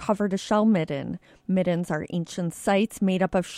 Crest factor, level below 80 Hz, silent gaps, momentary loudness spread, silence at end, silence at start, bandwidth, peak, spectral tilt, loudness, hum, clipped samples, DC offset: 16 dB; -56 dBFS; none; 9 LU; 0 s; 0 s; 13.5 kHz; -10 dBFS; -6.5 dB/octave; -25 LUFS; none; under 0.1%; under 0.1%